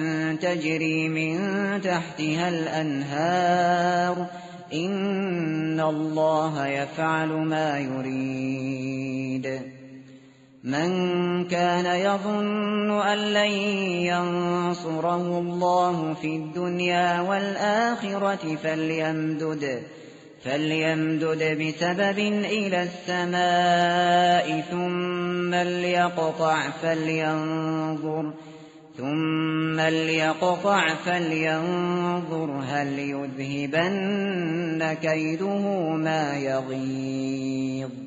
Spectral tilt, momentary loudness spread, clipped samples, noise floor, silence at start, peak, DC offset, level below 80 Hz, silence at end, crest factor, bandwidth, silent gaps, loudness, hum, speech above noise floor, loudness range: -4 dB/octave; 8 LU; under 0.1%; -51 dBFS; 0 s; -8 dBFS; under 0.1%; -68 dBFS; 0 s; 16 dB; 8 kHz; none; -25 LUFS; none; 26 dB; 4 LU